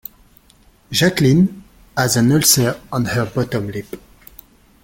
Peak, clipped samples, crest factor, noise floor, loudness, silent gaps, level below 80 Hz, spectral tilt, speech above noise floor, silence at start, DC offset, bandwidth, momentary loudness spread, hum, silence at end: 0 dBFS; under 0.1%; 18 dB; -51 dBFS; -16 LUFS; none; -46 dBFS; -4.5 dB/octave; 35 dB; 0.9 s; under 0.1%; 17 kHz; 17 LU; none; 0.85 s